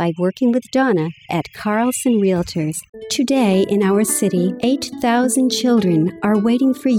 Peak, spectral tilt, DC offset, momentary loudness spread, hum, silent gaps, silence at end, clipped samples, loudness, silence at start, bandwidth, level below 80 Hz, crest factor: -6 dBFS; -5 dB/octave; under 0.1%; 7 LU; none; 2.89-2.93 s; 0 s; under 0.1%; -17 LUFS; 0 s; 17.5 kHz; -54 dBFS; 10 dB